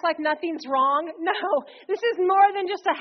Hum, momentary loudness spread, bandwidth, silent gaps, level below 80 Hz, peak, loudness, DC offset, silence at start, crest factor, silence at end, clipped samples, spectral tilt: none; 8 LU; 6.2 kHz; none; -78 dBFS; -6 dBFS; -23 LUFS; under 0.1%; 0.05 s; 16 dB; 0 s; under 0.1%; 0.5 dB/octave